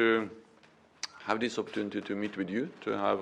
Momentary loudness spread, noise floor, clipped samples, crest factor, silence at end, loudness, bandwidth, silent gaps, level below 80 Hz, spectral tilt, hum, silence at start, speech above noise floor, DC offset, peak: 11 LU; -61 dBFS; under 0.1%; 22 dB; 0 s; -34 LUFS; 10 kHz; none; -76 dBFS; -4.5 dB/octave; none; 0 s; 30 dB; under 0.1%; -12 dBFS